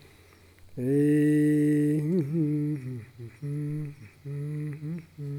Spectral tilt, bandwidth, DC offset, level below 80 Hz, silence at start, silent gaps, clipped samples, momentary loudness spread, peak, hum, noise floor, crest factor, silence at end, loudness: -9 dB/octave; 13 kHz; under 0.1%; -66 dBFS; 0.65 s; none; under 0.1%; 18 LU; -16 dBFS; none; -55 dBFS; 12 dB; 0 s; -27 LUFS